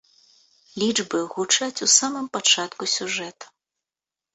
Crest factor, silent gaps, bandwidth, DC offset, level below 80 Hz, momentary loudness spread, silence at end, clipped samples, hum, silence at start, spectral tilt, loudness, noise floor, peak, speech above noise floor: 22 dB; none; 8.4 kHz; under 0.1%; -72 dBFS; 11 LU; 0.9 s; under 0.1%; none; 0.75 s; -0.5 dB/octave; -21 LUFS; -90 dBFS; -4 dBFS; 67 dB